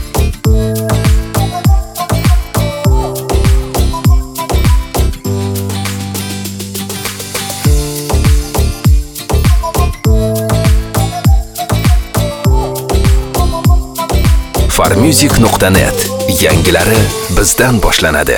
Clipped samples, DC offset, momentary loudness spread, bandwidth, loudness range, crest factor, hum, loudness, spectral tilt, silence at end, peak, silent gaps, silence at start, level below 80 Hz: 0.2%; under 0.1%; 8 LU; 19 kHz; 6 LU; 10 dB; none; -12 LUFS; -5 dB/octave; 0 s; 0 dBFS; none; 0 s; -14 dBFS